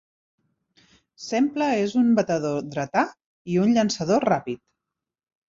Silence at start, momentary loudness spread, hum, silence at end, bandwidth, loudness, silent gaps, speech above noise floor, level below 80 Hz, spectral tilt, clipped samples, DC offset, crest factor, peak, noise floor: 1.2 s; 11 LU; none; 0.9 s; 7.6 kHz; -23 LUFS; 3.26-3.45 s; 64 dB; -64 dBFS; -5.5 dB/octave; under 0.1%; under 0.1%; 18 dB; -6 dBFS; -86 dBFS